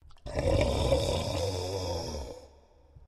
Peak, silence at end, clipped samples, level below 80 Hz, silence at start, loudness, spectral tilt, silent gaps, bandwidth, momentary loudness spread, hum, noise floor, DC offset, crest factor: -12 dBFS; 0 s; under 0.1%; -40 dBFS; 0.15 s; -31 LUFS; -5.5 dB/octave; none; 13.5 kHz; 13 LU; none; -58 dBFS; under 0.1%; 18 dB